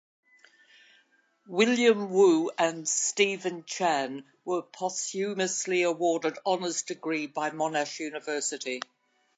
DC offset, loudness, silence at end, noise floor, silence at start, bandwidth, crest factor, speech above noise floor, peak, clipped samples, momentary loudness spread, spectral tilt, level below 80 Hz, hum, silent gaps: under 0.1%; -28 LUFS; 0.55 s; -67 dBFS; 1.5 s; 9.4 kHz; 20 dB; 39 dB; -8 dBFS; under 0.1%; 12 LU; -3 dB/octave; -86 dBFS; none; none